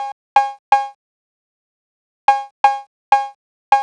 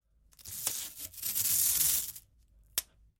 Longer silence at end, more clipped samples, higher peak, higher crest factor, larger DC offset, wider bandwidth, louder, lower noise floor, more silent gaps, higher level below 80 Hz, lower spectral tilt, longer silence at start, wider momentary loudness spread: second, 0 s vs 0.35 s; neither; first, -2 dBFS vs -10 dBFS; second, 18 dB vs 24 dB; neither; second, 9.8 kHz vs 17 kHz; first, -18 LUFS vs -30 LUFS; first, under -90 dBFS vs -63 dBFS; first, 0.12-0.36 s, 0.59-0.72 s, 0.95-2.28 s, 2.51-2.64 s, 2.87-3.12 s, 3.35-3.72 s vs none; about the same, -64 dBFS vs -62 dBFS; first, -0.5 dB/octave vs 1 dB/octave; second, 0 s vs 0.4 s; second, 9 LU vs 17 LU